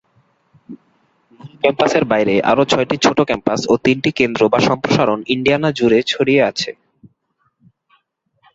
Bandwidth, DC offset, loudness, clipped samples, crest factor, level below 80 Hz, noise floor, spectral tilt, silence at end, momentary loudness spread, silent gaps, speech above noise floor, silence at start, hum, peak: 8 kHz; under 0.1%; -15 LUFS; under 0.1%; 16 dB; -52 dBFS; -65 dBFS; -5 dB/octave; 1.8 s; 4 LU; none; 50 dB; 0.7 s; none; -2 dBFS